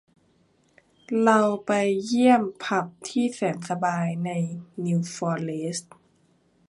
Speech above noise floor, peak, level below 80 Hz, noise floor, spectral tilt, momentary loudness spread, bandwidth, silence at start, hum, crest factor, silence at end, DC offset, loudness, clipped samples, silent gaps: 40 dB; -4 dBFS; -72 dBFS; -64 dBFS; -6 dB/octave; 11 LU; 11.5 kHz; 1.1 s; none; 20 dB; 0.9 s; under 0.1%; -25 LUFS; under 0.1%; none